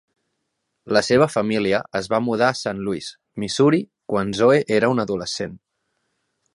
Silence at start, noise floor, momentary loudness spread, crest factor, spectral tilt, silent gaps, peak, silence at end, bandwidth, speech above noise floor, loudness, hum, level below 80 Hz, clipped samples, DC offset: 0.85 s; -76 dBFS; 11 LU; 20 dB; -5 dB/octave; none; -2 dBFS; 0.95 s; 11.5 kHz; 56 dB; -20 LUFS; none; -56 dBFS; under 0.1%; under 0.1%